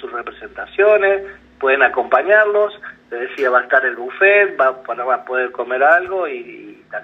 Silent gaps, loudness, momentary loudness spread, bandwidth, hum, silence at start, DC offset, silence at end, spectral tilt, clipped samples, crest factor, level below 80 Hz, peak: none; -15 LUFS; 18 LU; 5.8 kHz; none; 0 s; under 0.1%; 0 s; -5 dB/octave; under 0.1%; 16 dB; -58 dBFS; 0 dBFS